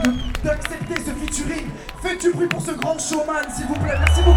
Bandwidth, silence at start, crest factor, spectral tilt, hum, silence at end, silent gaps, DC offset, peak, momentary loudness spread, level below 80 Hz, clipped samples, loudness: 17 kHz; 0 s; 20 dB; -5 dB/octave; none; 0 s; none; under 0.1%; 0 dBFS; 7 LU; -26 dBFS; under 0.1%; -23 LUFS